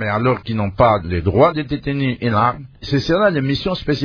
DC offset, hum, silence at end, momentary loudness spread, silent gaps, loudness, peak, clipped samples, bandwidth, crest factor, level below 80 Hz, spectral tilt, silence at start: under 0.1%; none; 0 s; 7 LU; none; -18 LUFS; 0 dBFS; under 0.1%; 5.4 kHz; 16 dB; -38 dBFS; -7.5 dB/octave; 0 s